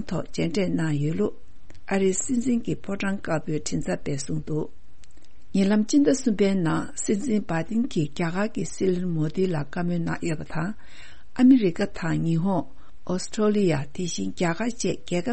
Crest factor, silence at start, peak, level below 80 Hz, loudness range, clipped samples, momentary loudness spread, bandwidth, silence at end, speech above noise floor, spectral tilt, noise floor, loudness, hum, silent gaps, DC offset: 18 dB; 0 s; -6 dBFS; -50 dBFS; 4 LU; under 0.1%; 10 LU; 8.8 kHz; 0 s; 28 dB; -6 dB/octave; -52 dBFS; -25 LUFS; none; none; 3%